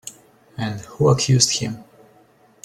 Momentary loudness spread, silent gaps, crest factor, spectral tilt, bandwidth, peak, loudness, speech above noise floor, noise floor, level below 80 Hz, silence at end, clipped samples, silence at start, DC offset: 22 LU; none; 20 dB; -4 dB/octave; 13.5 kHz; -2 dBFS; -19 LUFS; 35 dB; -54 dBFS; -52 dBFS; 0.8 s; under 0.1%; 0.05 s; under 0.1%